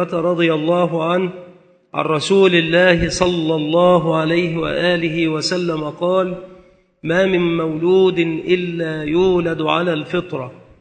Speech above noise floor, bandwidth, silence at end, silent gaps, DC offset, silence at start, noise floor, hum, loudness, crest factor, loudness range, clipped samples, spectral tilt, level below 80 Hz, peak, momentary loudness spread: 32 dB; 9 kHz; 0.25 s; none; under 0.1%; 0 s; -48 dBFS; none; -17 LUFS; 16 dB; 4 LU; under 0.1%; -5.5 dB/octave; -44 dBFS; 0 dBFS; 10 LU